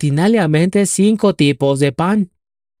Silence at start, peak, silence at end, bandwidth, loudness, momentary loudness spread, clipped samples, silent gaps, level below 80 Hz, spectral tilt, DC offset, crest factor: 0 s; -2 dBFS; 0.55 s; 15.5 kHz; -14 LUFS; 4 LU; under 0.1%; none; -52 dBFS; -5.5 dB/octave; under 0.1%; 14 dB